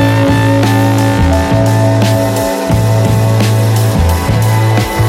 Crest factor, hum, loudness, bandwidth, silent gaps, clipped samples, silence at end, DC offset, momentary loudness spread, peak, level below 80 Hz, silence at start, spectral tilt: 8 dB; none; -11 LUFS; 16 kHz; none; under 0.1%; 0 s; under 0.1%; 2 LU; 0 dBFS; -24 dBFS; 0 s; -6.5 dB/octave